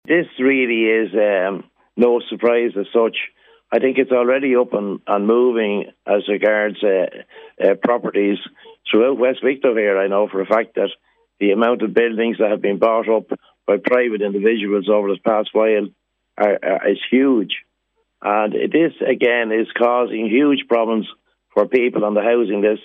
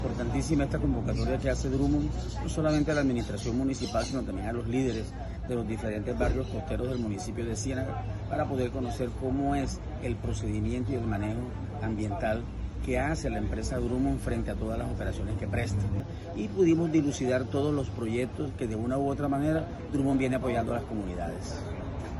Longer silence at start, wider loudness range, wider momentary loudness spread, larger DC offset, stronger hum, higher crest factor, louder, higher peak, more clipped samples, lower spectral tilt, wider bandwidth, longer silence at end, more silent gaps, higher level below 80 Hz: about the same, 0.1 s vs 0 s; about the same, 1 LU vs 3 LU; about the same, 7 LU vs 8 LU; neither; neither; about the same, 16 dB vs 16 dB; first, -18 LUFS vs -31 LUFS; first, -2 dBFS vs -14 dBFS; neither; first, -8 dB/octave vs -6.5 dB/octave; second, 4.1 kHz vs 12 kHz; about the same, 0.05 s vs 0 s; neither; second, -70 dBFS vs -38 dBFS